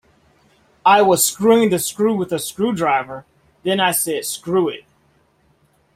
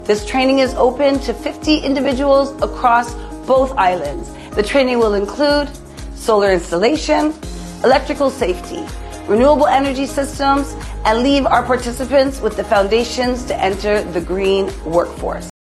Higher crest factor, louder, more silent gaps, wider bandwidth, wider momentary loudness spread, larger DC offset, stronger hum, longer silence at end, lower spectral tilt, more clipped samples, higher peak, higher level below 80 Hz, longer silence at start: about the same, 18 dB vs 16 dB; about the same, -17 LUFS vs -16 LUFS; neither; first, 16 kHz vs 12.5 kHz; about the same, 11 LU vs 12 LU; neither; neither; first, 1.15 s vs 0.3 s; second, -3.5 dB/octave vs -5 dB/octave; neither; about the same, -2 dBFS vs 0 dBFS; second, -60 dBFS vs -32 dBFS; first, 0.85 s vs 0 s